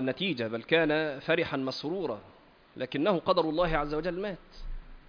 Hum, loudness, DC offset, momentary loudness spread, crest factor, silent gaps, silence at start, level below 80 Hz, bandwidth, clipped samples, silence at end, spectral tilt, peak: none; -30 LUFS; under 0.1%; 15 LU; 20 dB; none; 0 s; -46 dBFS; 5.2 kHz; under 0.1%; 0.1 s; -6.5 dB/octave; -10 dBFS